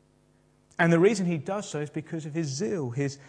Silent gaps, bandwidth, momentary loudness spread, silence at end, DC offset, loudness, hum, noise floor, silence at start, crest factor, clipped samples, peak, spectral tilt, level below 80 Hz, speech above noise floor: none; 10 kHz; 13 LU; 0.05 s; under 0.1%; -27 LUFS; none; -63 dBFS; 0.8 s; 20 dB; under 0.1%; -6 dBFS; -6 dB/octave; -70 dBFS; 37 dB